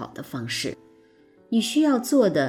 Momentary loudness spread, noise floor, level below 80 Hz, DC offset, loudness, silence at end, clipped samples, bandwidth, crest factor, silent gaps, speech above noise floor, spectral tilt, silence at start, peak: 14 LU; -56 dBFS; -66 dBFS; under 0.1%; -24 LUFS; 0 s; under 0.1%; 16.5 kHz; 16 dB; none; 33 dB; -4.5 dB/octave; 0 s; -8 dBFS